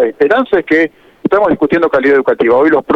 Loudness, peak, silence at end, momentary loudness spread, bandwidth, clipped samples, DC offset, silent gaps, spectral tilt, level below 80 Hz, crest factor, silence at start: -11 LUFS; -2 dBFS; 0 s; 4 LU; 6.4 kHz; under 0.1%; under 0.1%; none; -7.5 dB/octave; -46 dBFS; 10 dB; 0 s